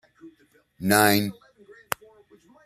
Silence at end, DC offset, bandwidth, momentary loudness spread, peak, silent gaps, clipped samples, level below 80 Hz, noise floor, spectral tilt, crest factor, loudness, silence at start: 1.35 s; under 0.1%; 15 kHz; 15 LU; 0 dBFS; none; under 0.1%; -64 dBFS; -61 dBFS; -3.5 dB/octave; 26 dB; -23 LUFS; 0.25 s